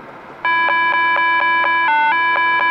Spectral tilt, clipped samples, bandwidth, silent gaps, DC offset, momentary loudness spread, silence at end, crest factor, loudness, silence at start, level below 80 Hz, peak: -3.5 dB/octave; under 0.1%; 6 kHz; none; under 0.1%; 2 LU; 0 s; 10 dB; -14 LUFS; 0 s; -62 dBFS; -6 dBFS